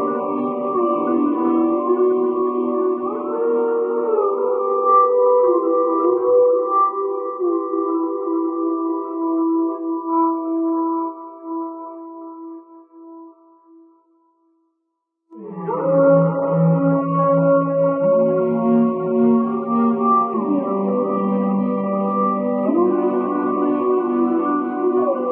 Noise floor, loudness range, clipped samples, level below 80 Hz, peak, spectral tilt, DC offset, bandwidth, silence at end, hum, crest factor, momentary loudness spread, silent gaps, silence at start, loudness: -75 dBFS; 8 LU; under 0.1%; -80 dBFS; -4 dBFS; -13.5 dB/octave; under 0.1%; 3.4 kHz; 0 s; none; 14 dB; 8 LU; none; 0 s; -18 LUFS